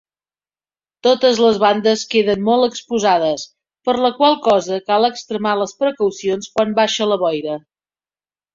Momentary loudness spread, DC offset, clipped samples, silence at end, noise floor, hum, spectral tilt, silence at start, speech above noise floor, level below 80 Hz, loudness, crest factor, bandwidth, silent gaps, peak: 9 LU; under 0.1%; under 0.1%; 0.95 s; under -90 dBFS; none; -4 dB/octave; 1.05 s; over 74 dB; -60 dBFS; -17 LUFS; 16 dB; 7.6 kHz; none; -2 dBFS